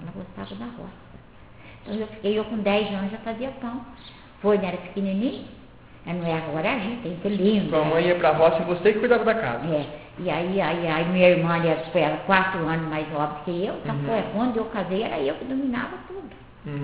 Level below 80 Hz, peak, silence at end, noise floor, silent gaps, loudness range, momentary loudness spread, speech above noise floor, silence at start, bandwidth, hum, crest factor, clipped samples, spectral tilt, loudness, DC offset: -52 dBFS; -4 dBFS; 0 s; -47 dBFS; none; 7 LU; 17 LU; 23 dB; 0 s; 4 kHz; none; 22 dB; under 0.1%; -10.5 dB/octave; -24 LUFS; 0.2%